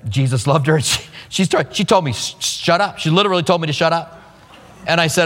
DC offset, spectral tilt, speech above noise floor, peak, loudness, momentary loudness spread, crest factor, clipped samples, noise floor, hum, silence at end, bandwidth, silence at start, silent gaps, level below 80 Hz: under 0.1%; -4.5 dB/octave; 26 dB; 0 dBFS; -17 LUFS; 6 LU; 16 dB; under 0.1%; -43 dBFS; none; 0 s; 16.5 kHz; 0.05 s; none; -50 dBFS